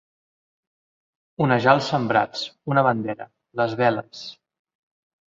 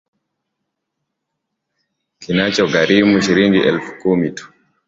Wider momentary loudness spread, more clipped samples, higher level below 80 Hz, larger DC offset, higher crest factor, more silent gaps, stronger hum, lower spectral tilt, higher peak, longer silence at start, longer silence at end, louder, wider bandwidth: first, 17 LU vs 8 LU; neither; second, -64 dBFS vs -52 dBFS; neither; first, 22 dB vs 16 dB; neither; neither; about the same, -6.5 dB/octave vs -5.5 dB/octave; about the same, -2 dBFS vs -2 dBFS; second, 1.4 s vs 2.2 s; first, 1 s vs 0.4 s; second, -22 LUFS vs -15 LUFS; about the same, 7.6 kHz vs 7.8 kHz